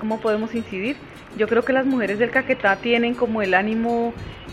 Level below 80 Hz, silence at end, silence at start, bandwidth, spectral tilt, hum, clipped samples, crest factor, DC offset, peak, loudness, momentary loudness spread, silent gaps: -50 dBFS; 0 s; 0 s; 11.5 kHz; -6 dB/octave; none; under 0.1%; 20 dB; under 0.1%; -2 dBFS; -21 LUFS; 9 LU; none